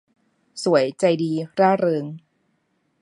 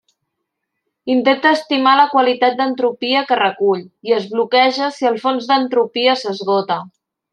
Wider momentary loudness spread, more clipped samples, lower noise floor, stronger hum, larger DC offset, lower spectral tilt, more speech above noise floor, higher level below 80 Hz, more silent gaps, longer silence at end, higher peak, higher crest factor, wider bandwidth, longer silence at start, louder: first, 18 LU vs 6 LU; neither; second, -69 dBFS vs -76 dBFS; neither; neither; first, -6 dB/octave vs -4.5 dB/octave; second, 49 dB vs 60 dB; about the same, -74 dBFS vs -72 dBFS; neither; first, 0.85 s vs 0.45 s; second, -4 dBFS vs 0 dBFS; about the same, 20 dB vs 16 dB; about the same, 11 kHz vs 10 kHz; second, 0.55 s vs 1.05 s; second, -21 LUFS vs -16 LUFS